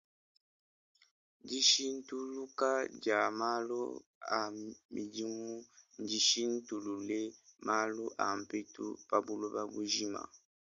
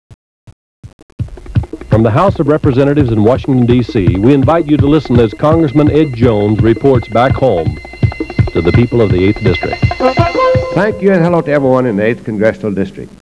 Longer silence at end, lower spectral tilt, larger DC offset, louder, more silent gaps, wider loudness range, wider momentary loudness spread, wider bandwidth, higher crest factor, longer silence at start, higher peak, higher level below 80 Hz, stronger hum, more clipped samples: about the same, 0.25 s vs 0.15 s; second, -1.5 dB/octave vs -8.5 dB/octave; second, under 0.1% vs 0.4%; second, -35 LUFS vs -11 LUFS; second, 4.06-4.21 s, 4.85-4.89 s vs 0.53-0.83 s, 0.93-1.18 s; about the same, 4 LU vs 2 LU; first, 15 LU vs 7 LU; about the same, 10.5 kHz vs 11 kHz; first, 22 dB vs 10 dB; first, 1.45 s vs 0.5 s; second, -14 dBFS vs 0 dBFS; second, -82 dBFS vs -28 dBFS; neither; neither